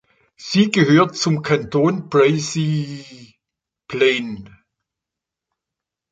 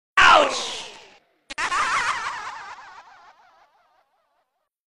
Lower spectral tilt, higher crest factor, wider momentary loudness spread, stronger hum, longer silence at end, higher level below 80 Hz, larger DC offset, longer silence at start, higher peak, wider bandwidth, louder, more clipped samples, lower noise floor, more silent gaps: first, -5.5 dB/octave vs -0.5 dB/octave; about the same, 18 dB vs 20 dB; second, 16 LU vs 25 LU; neither; second, 1.65 s vs 1.95 s; about the same, -58 dBFS vs -54 dBFS; neither; first, 0.4 s vs 0.15 s; about the same, -2 dBFS vs -4 dBFS; second, 9.2 kHz vs 12.5 kHz; first, -17 LUFS vs -20 LUFS; neither; first, -85 dBFS vs -73 dBFS; neither